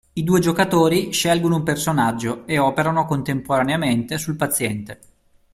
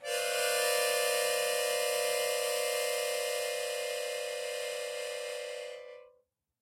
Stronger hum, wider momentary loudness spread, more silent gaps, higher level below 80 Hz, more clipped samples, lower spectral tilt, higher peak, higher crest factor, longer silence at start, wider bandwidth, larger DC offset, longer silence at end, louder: neither; second, 7 LU vs 10 LU; neither; first, -50 dBFS vs -86 dBFS; neither; first, -5 dB/octave vs 2 dB/octave; first, -2 dBFS vs -16 dBFS; about the same, 18 dB vs 16 dB; first, 0.15 s vs 0 s; about the same, 16 kHz vs 16 kHz; neither; about the same, 0.6 s vs 0.55 s; first, -20 LUFS vs -32 LUFS